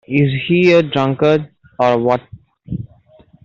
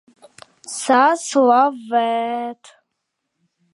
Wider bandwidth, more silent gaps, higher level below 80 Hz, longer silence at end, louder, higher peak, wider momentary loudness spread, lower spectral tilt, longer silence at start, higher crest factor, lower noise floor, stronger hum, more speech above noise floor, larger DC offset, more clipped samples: second, 7.4 kHz vs 11.5 kHz; neither; first, -50 dBFS vs -78 dBFS; second, 0.6 s vs 1.2 s; about the same, -15 LUFS vs -17 LUFS; about the same, -2 dBFS vs -2 dBFS; first, 17 LU vs 12 LU; first, -7.5 dB/octave vs -2.5 dB/octave; second, 0.1 s vs 0.65 s; about the same, 14 dB vs 18 dB; second, -48 dBFS vs -77 dBFS; neither; second, 34 dB vs 59 dB; neither; neither